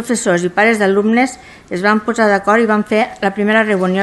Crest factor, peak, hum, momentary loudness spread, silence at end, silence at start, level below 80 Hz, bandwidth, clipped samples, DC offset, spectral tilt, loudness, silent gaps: 14 dB; 0 dBFS; none; 6 LU; 0 s; 0 s; -52 dBFS; 12.5 kHz; under 0.1%; under 0.1%; -5 dB/octave; -14 LUFS; none